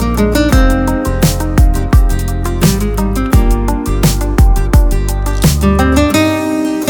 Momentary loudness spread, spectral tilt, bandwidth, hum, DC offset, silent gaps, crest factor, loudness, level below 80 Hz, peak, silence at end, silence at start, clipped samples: 5 LU; -6 dB/octave; 19.5 kHz; none; under 0.1%; none; 10 dB; -12 LUFS; -14 dBFS; 0 dBFS; 0 s; 0 s; under 0.1%